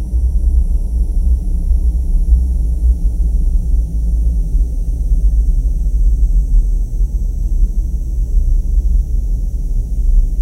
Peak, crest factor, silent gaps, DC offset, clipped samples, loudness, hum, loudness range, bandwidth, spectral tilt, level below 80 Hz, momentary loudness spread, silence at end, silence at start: 0 dBFS; 12 dB; none; under 0.1%; under 0.1%; -18 LUFS; none; 2 LU; 6.2 kHz; -9 dB/octave; -12 dBFS; 5 LU; 0 s; 0 s